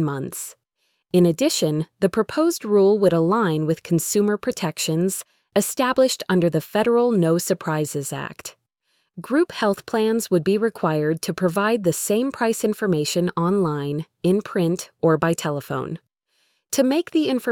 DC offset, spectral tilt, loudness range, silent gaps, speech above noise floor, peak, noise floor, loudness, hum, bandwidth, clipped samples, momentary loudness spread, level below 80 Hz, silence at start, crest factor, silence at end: under 0.1%; -5.5 dB/octave; 3 LU; none; 51 dB; -4 dBFS; -72 dBFS; -21 LUFS; none; 19 kHz; under 0.1%; 9 LU; -60 dBFS; 0 s; 16 dB; 0 s